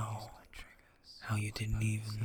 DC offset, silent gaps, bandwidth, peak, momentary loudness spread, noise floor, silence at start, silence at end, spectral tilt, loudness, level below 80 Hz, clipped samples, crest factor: under 0.1%; none; 17.5 kHz; -22 dBFS; 19 LU; -59 dBFS; 0 s; 0 s; -5.5 dB/octave; -38 LUFS; -50 dBFS; under 0.1%; 16 dB